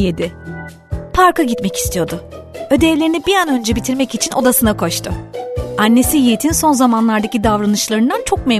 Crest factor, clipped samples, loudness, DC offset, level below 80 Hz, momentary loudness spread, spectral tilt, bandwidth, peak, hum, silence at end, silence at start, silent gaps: 14 dB; under 0.1%; -14 LUFS; under 0.1%; -32 dBFS; 13 LU; -4 dB/octave; 14 kHz; 0 dBFS; none; 0 s; 0 s; none